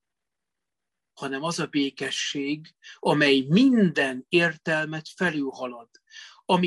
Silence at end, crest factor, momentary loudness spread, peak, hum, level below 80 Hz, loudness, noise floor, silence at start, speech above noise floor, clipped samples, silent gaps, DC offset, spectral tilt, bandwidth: 0 s; 18 dB; 17 LU; -8 dBFS; none; -70 dBFS; -24 LUFS; -87 dBFS; 1.2 s; 63 dB; under 0.1%; none; under 0.1%; -5 dB/octave; 12 kHz